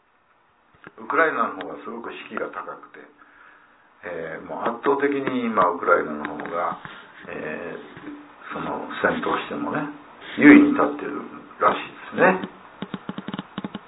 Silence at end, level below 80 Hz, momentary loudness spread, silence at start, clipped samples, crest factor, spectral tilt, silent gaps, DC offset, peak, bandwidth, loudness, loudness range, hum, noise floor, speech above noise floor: 0.1 s; -62 dBFS; 19 LU; 1 s; under 0.1%; 24 dB; -10 dB/octave; none; under 0.1%; 0 dBFS; 4 kHz; -22 LUFS; 10 LU; none; -61 dBFS; 39 dB